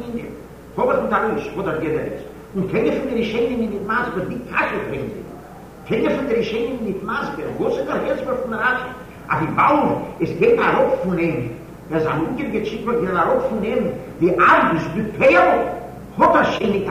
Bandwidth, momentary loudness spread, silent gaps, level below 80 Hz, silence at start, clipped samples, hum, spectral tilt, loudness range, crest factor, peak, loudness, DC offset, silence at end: 15.5 kHz; 15 LU; none; -44 dBFS; 0 s; under 0.1%; none; -7 dB/octave; 6 LU; 16 dB; -4 dBFS; -19 LUFS; under 0.1%; 0 s